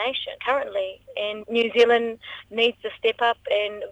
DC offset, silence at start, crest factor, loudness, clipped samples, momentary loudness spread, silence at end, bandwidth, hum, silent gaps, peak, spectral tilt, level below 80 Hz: under 0.1%; 0 s; 20 dB; -23 LUFS; under 0.1%; 12 LU; 0 s; 8 kHz; none; none; -4 dBFS; -3.5 dB/octave; -64 dBFS